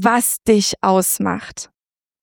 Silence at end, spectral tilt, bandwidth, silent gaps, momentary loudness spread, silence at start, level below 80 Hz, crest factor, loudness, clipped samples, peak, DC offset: 0.6 s; -3.5 dB/octave; 19.5 kHz; none; 17 LU; 0 s; -52 dBFS; 16 dB; -17 LUFS; under 0.1%; -2 dBFS; under 0.1%